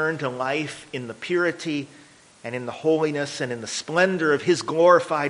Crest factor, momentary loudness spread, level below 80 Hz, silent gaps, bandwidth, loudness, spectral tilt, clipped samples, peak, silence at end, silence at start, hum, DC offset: 20 dB; 15 LU; -68 dBFS; none; 10.5 kHz; -23 LUFS; -4.5 dB/octave; under 0.1%; -2 dBFS; 0 s; 0 s; none; under 0.1%